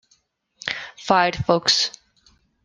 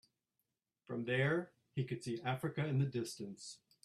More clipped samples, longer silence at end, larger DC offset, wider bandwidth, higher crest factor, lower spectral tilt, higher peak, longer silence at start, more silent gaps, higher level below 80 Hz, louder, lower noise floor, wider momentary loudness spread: neither; first, 0.75 s vs 0.3 s; neither; second, 12 kHz vs 13.5 kHz; about the same, 22 dB vs 18 dB; second, -3 dB/octave vs -6 dB/octave; first, -2 dBFS vs -22 dBFS; second, 0.65 s vs 0.9 s; neither; first, -52 dBFS vs -76 dBFS; first, -20 LUFS vs -39 LUFS; second, -64 dBFS vs -88 dBFS; about the same, 12 LU vs 12 LU